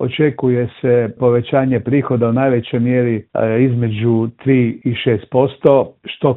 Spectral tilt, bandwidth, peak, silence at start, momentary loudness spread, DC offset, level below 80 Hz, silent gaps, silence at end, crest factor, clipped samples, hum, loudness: -11.5 dB/octave; 4 kHz; 0 dBFS; 0 s; 4 LU; under 0.1%; -54 dBFS; none; 0 s; 14 dB; under 0.1%; none; -16 LUFS